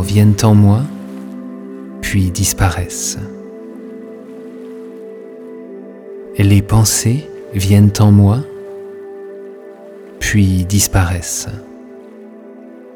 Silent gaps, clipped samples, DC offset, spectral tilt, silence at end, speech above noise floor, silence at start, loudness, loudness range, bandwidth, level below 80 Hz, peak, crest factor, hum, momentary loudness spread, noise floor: none; under 0.1%; under 0.1%; -5.5 dB/octave; 0.35 s; 24 dB; 0 s; -13 LUFS; 10 LU; 18.5 kHz; -34 dBFS; 0 dBFS; 14 dB; none; 25 LU; -35 dBFS